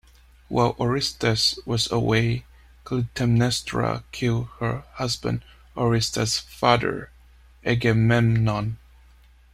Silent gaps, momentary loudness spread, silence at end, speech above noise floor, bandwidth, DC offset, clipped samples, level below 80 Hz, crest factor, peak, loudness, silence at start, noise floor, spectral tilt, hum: none; 9 LU; 0.75 s; 30 dB; 14.5 kHz; under 0.1%; under 0.1%; -46 dBFS; 20 dB; -4 dBFS; -23 LUFS; 0.5 s; -53 dBFS; -5 dB/octave; none